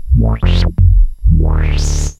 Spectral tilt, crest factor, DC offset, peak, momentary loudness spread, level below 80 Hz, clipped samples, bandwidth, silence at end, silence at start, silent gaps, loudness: -6 dB/octave; 10 dB; under 0.1%; 0 dBFS; 3 LU; -12 dBFS; under 0.1%; 9.4 kHz; 0.05 s; 0 s; none; -14 LUFS